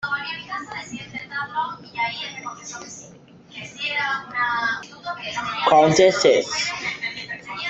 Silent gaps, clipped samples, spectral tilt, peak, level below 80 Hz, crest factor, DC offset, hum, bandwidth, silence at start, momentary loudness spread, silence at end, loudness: none; under 0.1%; -3.5 dB/octave; -4 dBFS; -60 dBFS; 20 dB; under 0.1%; none; 8.2 kHz; 0 s; 19 LU; 0 s; -22 LUFS